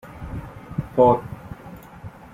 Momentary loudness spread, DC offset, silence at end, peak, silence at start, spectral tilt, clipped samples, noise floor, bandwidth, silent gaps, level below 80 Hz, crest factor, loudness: 24 LU; under 0.1%; 0.25 s; -4 dBFS; 0.05 s; -9 dB/octave; under 0.1%; -41 dBFS; 15.5 kHz; none; -44 dBFS; 22 dB; -20 LUFS